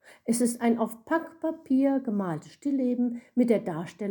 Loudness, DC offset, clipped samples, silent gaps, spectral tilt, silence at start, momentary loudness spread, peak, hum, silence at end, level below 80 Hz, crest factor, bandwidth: -28 LUFS; under 0.1%; under 0.1%; none; -6 dB/octave; 0.1 s; 9 LU; -10 dBFS; none; 0 s; -74 dBFS; 18 dB; 19 kHz